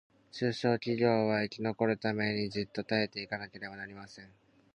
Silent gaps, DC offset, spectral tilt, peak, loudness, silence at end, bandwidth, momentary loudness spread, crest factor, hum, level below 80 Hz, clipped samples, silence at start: none; under 0.1%; -6.5 dB/octave; -14 dBFS; -32 LUFS; 0.5 s; 9.6 kHz; 16 LU; 20 dB; none; -68 dBFS; under 0.1%; 0.35 s